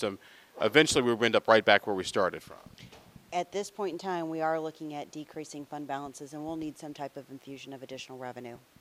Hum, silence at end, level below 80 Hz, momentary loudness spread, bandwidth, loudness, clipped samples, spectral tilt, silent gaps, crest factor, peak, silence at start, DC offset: none; 0.2 s; -66 dBFS; 22 LU; 15.5 kHz; -29 LUFS; under 0.1%; -3.5 dB/octave; none; 26 dB; -4 dBFS; 0 s; under 0.1%